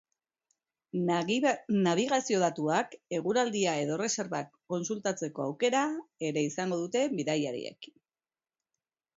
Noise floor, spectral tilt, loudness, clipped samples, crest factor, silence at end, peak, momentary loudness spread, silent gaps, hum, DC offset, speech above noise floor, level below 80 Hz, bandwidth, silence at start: under -90 dBFS; -4.5 dB/octave; -31 LUFS; under 0.1%; 18 dB; 1.3 s; -14 dBFS; 9 LU; none; none; under 0.1%; over 60 dB; -78 dBFS; 8 kHz; 0.95 s